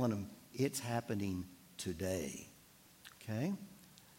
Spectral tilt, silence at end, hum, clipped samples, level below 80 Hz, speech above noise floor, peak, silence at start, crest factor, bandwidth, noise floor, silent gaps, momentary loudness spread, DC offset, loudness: -5.5 dB/octave; 0 s; none; under 0.1%; -72 dBFS; 24 dB; -22 dBFS; 0 s; 20 dB; 16.5 kHz; -63 dBFS; none; 19 LU; under 0.1%; -41 LUFS